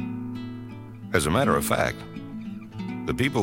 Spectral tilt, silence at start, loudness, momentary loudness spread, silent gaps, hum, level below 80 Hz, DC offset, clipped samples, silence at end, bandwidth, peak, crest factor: -5 dB/octave; 0 s; -27 LUFS; 16 LU; none; none; -46 dBFS; under 0.1%; under 0.1%; 0 s; 16 kHz; -6 dBFS; 22 dB